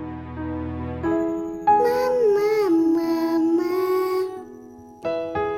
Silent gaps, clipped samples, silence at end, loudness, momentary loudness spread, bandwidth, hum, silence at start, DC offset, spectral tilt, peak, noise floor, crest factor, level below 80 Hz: none; under 0.1%; 0 s; -22 LUFS; 12 LU; 16.5 kHz; none; 0 s; under 0.1%; -7 dB/octave; -8 dBFS; -43 dBFS; 14 dB; -48 dBFS